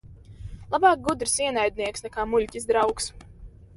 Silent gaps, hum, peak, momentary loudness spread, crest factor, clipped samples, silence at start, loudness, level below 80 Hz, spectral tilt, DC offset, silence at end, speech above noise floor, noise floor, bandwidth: none; none; -6 dBFS; 13 LU; 20 dB; under 0.1%; 0.05 s; -24 LUFS; -46 dBFS; -3 dB/octave; under 0.1%; 0.25 s; 22 dB; -46 dBFS; 11.5 kHz